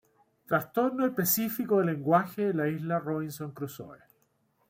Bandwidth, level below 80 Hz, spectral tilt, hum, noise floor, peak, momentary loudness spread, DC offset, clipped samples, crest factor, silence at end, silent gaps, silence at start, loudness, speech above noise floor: 16.5 kHz; -72 dBFS; -5.5 dB/octave; none; -71 dBFS; -10 dBFS; 13 LU; under 0.1%; under 0.1%; 20 dB; 0.75 s; none; 0.5 s; -29 LUFS; 43 dB